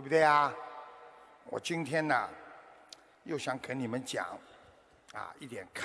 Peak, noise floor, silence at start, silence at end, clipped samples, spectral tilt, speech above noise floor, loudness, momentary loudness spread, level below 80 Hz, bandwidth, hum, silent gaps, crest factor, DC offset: -12 dBFS; -61 dBFS; 0 s; 0 s; under 0.1%; -4.5 dB/octave; 29 dB; -33 LUFS; 26 LU; -76 dBFS; 11 kHz; none; none; 22 dB; under 0.1%